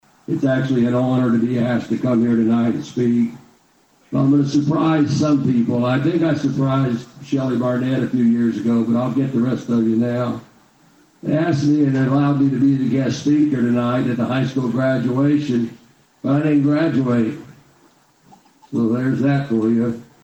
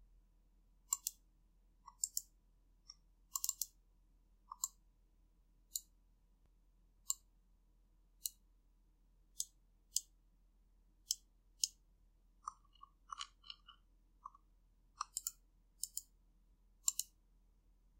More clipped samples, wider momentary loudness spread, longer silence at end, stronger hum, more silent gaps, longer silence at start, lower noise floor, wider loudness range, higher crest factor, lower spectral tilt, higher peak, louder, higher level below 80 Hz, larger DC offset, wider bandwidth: neither; second, 6 LU vs 19 LU; second, 0.2 s vs 0.95 s; neither; neither; first, 0.3 s vs 0 s; second, -56 dBFS vs -71 dBFS; about the same, 3 LU vs 5 LU; second, 12 dB vs 36 dB; first, -8 dB/octave vs 2.5 dB/octave; first, -6 dBFS vs -14 dBFS; first, -18 LUFS vs -44 LUFS; first, -56 dBFS vs -72 dBFS; neither; second, 8.4 kHz vs 16 kHz